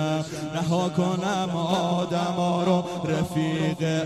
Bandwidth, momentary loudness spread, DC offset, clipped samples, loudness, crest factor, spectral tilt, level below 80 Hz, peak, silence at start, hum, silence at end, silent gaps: 13 kHz; 4 LU; under 0.1%; under 0.1%; -25 LUFS; 16 dB; -6 dB/octave; -58 dBFS; -8 dBFS; 0 s; none; 0 s; none